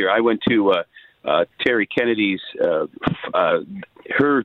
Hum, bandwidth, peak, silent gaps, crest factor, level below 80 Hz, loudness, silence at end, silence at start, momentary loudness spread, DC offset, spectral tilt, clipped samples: none; 6 kHz; -4 dBFS; none; 16 dB; -54 dBFS; -20 LUFS; 0 s; 0 s; 8 LU; under 0.1%; -7.5 dB/octave; under 0.1%